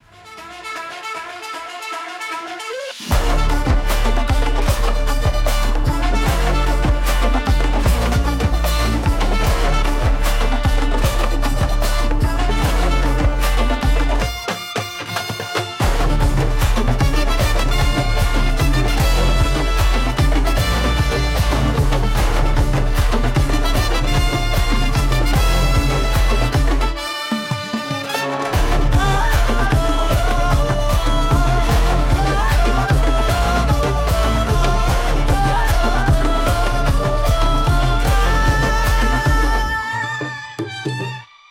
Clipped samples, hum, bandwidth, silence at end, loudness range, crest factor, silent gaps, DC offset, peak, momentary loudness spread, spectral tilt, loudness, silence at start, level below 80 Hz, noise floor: under 0.1%; none; 16.5 kHz; 0.25 s; 3 LU; 12 dB; none; under 0.1%; -4 dBFS; 7 LU; -5 dB/octave; -19 LUFS; 0.25 s; -18 dBFS; -38 dBFS